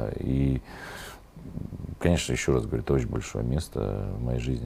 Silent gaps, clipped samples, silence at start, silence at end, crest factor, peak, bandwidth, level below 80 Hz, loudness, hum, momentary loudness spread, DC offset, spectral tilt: none; under 0.1%; 0 s; 0 s; 20 dB; -8 dBFS; 15.5 kHz; -38 dBFS; -28 LUFS; none; 15 LU; under 0.1%; -6 dB/octave